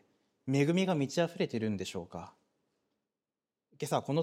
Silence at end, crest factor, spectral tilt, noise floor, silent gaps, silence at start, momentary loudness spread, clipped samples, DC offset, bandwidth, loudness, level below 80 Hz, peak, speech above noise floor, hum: 0 s; 20 dB; -6 dB/octave; under -90 dBFS; none; 0.45 s; 17 LU; under 0.1%; under 0.1%; 15.5 kHz; -33 LUFS; -74 dBFS; -16 dBFS; over 58 dB; none